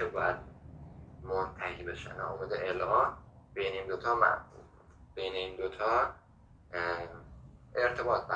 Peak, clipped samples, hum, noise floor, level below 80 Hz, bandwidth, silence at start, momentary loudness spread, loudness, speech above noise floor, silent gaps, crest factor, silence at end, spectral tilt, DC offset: -10 dBFS; under 0.1%; none; -59 dBFS; -56 dBFS; 9.4 kHz; 0 s; 22 LU; -33 LUFS; 26 dB; none; 24 dB; 0 s; -5.5 dB/octave; under 0.1%